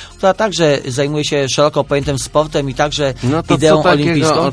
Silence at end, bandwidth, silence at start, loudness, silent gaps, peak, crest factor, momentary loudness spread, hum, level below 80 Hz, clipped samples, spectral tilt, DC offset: 0 s; 11 kHz; 0 s; -14 LUFS; none; 0 dBFS; 14 dB; 6 LU; none; -38 dBFS; under 0.1%; -5 dB/octave; under 0.1%